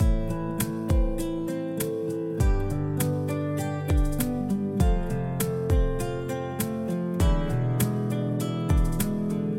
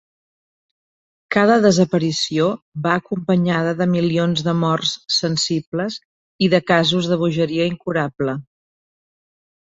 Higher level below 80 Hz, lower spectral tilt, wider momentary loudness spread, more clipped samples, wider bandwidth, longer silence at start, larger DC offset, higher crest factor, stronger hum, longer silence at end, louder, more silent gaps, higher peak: first, -30 dBFS vs -58 dBFS; first, -6.5 dB/octave vs -5 dB/octave; second, 5 LU vs 9 LU; neither; first, 16.5 kHz vs 8.2 kHz; second, 0 s vs 1.3 s; neither; about the same, 16 dB vs 18 dB; neither; second, 0 s vs 1.3 s; second, -27 LUFS vs -18 LUFS; second, none vs 2.62-2.72 s, 5.67-5.72 s, 6.05-6.39 s; second, -10 dBFS vs -2 dBFS